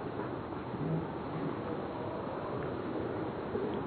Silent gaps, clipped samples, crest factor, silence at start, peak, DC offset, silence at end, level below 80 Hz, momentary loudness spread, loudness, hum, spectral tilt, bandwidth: none; under 0.1%; 14 dB; 0 s; -24 dBFS; under 0.1%; 0 s; -58 dBFS; 3 LU; -38 LUFS; none; -7 dB/octave; 4.5 kHz